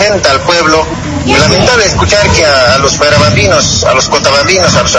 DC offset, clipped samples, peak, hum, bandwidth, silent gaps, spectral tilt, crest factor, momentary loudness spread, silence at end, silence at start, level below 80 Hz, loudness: under 0.1%; 2%; 0 dBFS; none; 11 kHz; none; -3.5 dB/octave; 8 dB; 3 LU; 0 s; 0 s; -26 dBFS; -6 LUFS